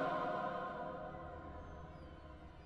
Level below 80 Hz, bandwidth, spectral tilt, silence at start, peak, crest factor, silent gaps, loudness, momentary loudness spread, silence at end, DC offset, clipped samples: -60 dBFS; 10 kHz; -7 dB/octave; 0 s; -26 dBFS; 18 dB; none; -45 LUFS; 15 LU; 0 s; under 0.1%; under 0.1%